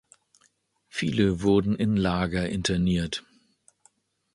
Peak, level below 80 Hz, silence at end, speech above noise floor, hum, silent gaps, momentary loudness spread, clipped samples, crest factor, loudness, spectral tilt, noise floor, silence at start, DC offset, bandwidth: -10 dBFS; -46 dBFS; 1.15 s; 43 dB; none; none; 9 LU; under 0.1%; 18 dB; -26 LUFS; -6 dB/octave; -67 dBFS; 0.95 s; under 0.1%; 11.5 kHz